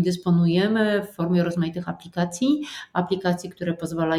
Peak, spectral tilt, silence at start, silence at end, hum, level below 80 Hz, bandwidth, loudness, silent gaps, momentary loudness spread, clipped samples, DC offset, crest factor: -6 dBFS; -6.5 dB/octave; 0 s; 0 s; none; -60 dBFS; 13.5 kHz; -24 LUFS; none; 9 LU; under 0.1%; under 0.1%; 16 dB